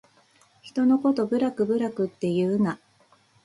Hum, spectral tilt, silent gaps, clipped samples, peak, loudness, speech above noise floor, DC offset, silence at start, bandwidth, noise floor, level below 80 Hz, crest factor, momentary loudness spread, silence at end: none; -8 dB/octave; none; under 0.1%; -12 dBFS; -25 LUFS; 37 dB; under 0.1%; 0.65 s; 11 kHz; -61 dBFS; -70 dBFS; 14 dB; 7 LU; 0.7 s